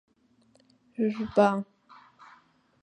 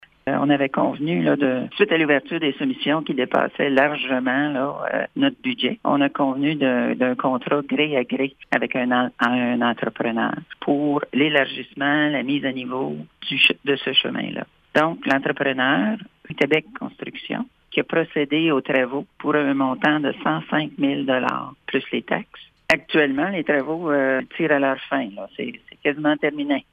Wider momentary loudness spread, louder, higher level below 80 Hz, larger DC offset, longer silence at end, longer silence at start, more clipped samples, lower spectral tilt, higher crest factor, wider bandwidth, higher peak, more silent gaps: first, 20 LU vs 8 LU; second, -27 LUFS vs -21 LUFS; about the same, -68 dBFS vs -64 dBFS; neither; first, 1.2 s vs 0.1 s; first, 1 s vs 0.25 s; neither; about the same, -7.5 dB/octave vs -6.5 dB/octave; first, 24 dB vs 18 dB; about the same, 9 kHz vs 9.8 kHz; second, -8 dBFS vs -4 dBFS; neither